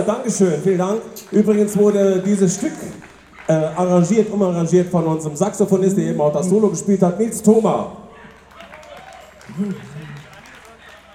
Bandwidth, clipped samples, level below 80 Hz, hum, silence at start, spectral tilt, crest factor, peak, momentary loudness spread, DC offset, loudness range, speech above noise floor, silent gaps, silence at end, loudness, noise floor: 15 kHz; under 0.1%; -56 dBFS; none; 0 s; -6.5 dB/octave; 18 dB; 0 dBFS; 20 LU; under 0.1%; 5 LU; 26 dB; none; 0.2 s; -17 LUFS; -43 dBFS